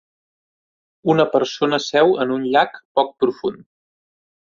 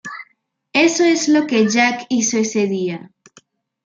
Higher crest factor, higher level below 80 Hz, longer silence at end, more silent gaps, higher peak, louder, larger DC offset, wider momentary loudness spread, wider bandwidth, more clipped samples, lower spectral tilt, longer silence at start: about the same, 18 dB vs 16 dB; about the same, -62 dBFS vs -66 dBFS; first, 1.05 s vs 0.8 s; first, 2.85-2.95 s vs none; about the same, -2 dBFS vs -2 dBFS; second, -19 LUFS vs -16 LUFS; neither; second, 7 LU vs 14 LU; second, 7.4 kHz vs 9.4 kHz; neither; first, -5 dB/octave vs -3.5 dB/octave; first, 1.05 s vs 0.05 s